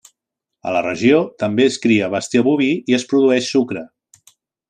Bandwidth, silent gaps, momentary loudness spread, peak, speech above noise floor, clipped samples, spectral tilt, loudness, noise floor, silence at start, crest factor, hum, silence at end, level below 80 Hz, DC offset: 10 kHz; none; 7 LU; -2 dBFS; 66 dB; under 0.1%; -5 dB/octave; -17 LUFS; -82 dBFS; 0.65 s; 16 dB; none; 0.85 s; -62 dBFS; under 0.1%